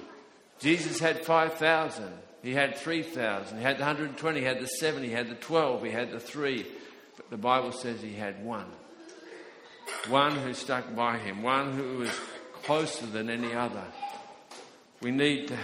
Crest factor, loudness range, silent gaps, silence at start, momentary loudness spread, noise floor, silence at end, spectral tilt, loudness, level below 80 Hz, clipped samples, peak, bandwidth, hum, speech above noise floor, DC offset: 22 dB; 5 LU; none; 0 s; 21 LU; -53 dBFS; 0 s; -4 dB/octave; -30 LUFS; -72 dBFS; under 0.1%; -8 dBFS; 15.5 kHz; none; 24 dB; under 0.1%